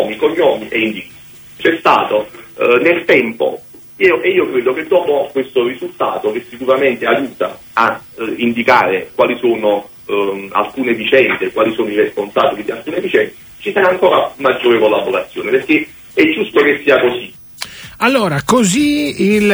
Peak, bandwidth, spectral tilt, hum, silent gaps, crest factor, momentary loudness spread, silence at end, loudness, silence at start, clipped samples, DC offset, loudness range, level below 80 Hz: 0 dBFS; over 20 kHz; -4.5 dB/octave; none; none; 14 dB; 10 LU; 0 s; -14 LUFS; 0 s; under 0.1%; under 0.1%; 2 LU; -52 dBFS